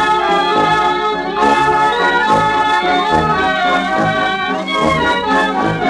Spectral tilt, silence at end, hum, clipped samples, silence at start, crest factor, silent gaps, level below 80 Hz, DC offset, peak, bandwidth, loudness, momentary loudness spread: -4.5 dB/octave; 0 s; none; under 0.1%; 0 s; 12 dB; none; -40 dBFS; under 0.1%; -2 dBFS; 11.5 kHz; -13 LUFS; 3 LU